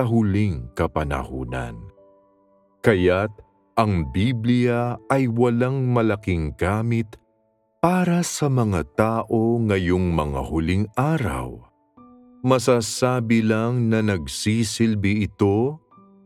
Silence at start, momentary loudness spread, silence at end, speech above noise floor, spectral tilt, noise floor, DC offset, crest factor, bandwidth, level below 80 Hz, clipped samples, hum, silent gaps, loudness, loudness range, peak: 0 s; 8 LU; 0.5 s; 45 dB; -6.5 dB/octave; -66 dBFS; under 0.1%; 20 dB; 14.5 kHz; -40 dBFS; under 0.1%; none; none; -22 LUFS; 3 LU; -2 dBFS